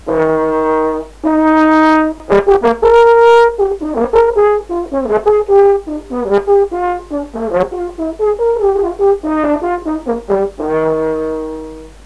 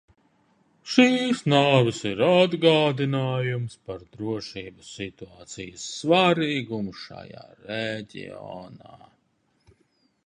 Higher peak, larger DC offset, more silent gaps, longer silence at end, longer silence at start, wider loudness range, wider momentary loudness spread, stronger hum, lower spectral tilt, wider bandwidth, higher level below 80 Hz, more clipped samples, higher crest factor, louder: about the same, 0 dBFS vs -2 dBFS; first, 0.4% vs under 0.1%; neither; second, 0.15 s vs 1.3 s; second, 0.05 s vs 0.85 s; second, 5 LU vs 13 LU; second, 11 LU vs 21 LU; neither; about the same, -6.5 dB/octave vs -5.5 dB/octave; about the same, 11 kHz vs 10.5 kHz; first, -36 dBFS vs -62 dBFS; first, 0.7% vs under 0.1%; second, 12 dB vs 22 dB; first, -13 LUFS vs -23 LUFS